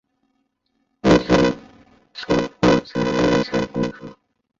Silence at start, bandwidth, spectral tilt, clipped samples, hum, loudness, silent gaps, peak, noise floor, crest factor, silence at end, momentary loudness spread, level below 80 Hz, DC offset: 1.05 s; 7.8 kHz; -6 dB/octave; under 0.1%; none; -19 LUFS; none; -2 dBFS; -70 dBFS; 18 dB; 0.45 s; 18 LU; -42 dBFS; under 0.1%